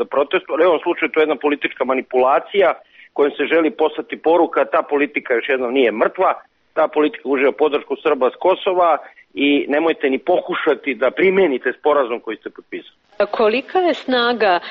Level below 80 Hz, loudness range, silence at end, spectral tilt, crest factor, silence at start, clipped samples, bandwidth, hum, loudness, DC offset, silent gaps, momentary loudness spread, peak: -64 dBFS; 1 LU; 0 s; -1.5 dB/octave; 12 dB; 0 s; under 0.1%; 5.8 kHz; none; -17 LUFS; under 0.1%; none; 7 LU; -4 dBFS